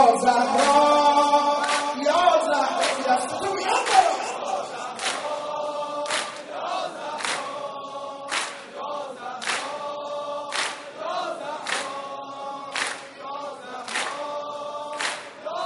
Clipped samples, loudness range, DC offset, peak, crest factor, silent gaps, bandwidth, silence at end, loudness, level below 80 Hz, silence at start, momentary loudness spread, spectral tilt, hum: under 0.1%; 10 LU; under 0.1%; -4 dBFS; 20 dB; none; 11.5 kHz; 0 s; -25 LUFS; -68 dBFS; 0 s; 15 LU; -1.5 dB/octave; none